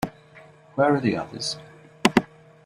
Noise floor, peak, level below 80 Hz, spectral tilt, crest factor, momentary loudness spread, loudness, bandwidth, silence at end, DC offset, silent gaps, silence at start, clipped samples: -50 dBFS; -2 dBFS; -58 dBFS; -5 dB/octave; 24 dB; 14 LU; -24 LUFS; 14.5 kHz; 0.4 s; under 0.1%; none; 0 s; under 0.1%